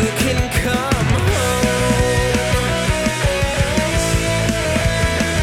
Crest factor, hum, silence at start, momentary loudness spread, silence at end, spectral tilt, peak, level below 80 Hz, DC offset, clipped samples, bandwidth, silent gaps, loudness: 14 dB; none; 0 s; 2 LU; 0 s; -4.5 dB/octave; -4 dBFS; -26 dBFS; under 0.1%; under 0.1%; 17 kHz; none; -17 LUFS